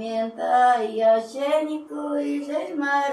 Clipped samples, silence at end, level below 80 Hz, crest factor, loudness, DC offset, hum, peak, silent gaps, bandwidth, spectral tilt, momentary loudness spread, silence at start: under 0.1%; 0 s; -80 dBFS; 14 dB; -23 LUFS; under 0.1%; none; -10 dBFS; none; 12 kHz; -4 dB/octave; 9 LU; 0 s